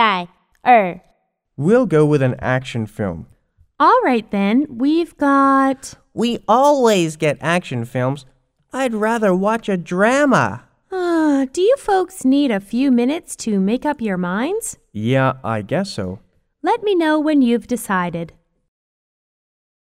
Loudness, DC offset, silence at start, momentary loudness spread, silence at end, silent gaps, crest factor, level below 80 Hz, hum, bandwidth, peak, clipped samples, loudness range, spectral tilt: -17 LUFS; under 0.1%; 0 s; 12 LU; 1.55 s; none; 18 dB; -52 dBFS; none; 16 kHz; 0 dBFS; under 0.1%; 4 LU; -6 dB/octave